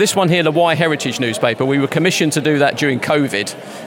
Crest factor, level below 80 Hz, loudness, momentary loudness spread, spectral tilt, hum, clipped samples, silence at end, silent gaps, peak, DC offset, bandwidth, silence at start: 16 dB; -64 dBFS; -16 LUFS; 5 LU; -4.5 dB/octave; none; under 0.1%; 0 s; none; 0 dBFS; under 0.1%; 17 kHz; 0 s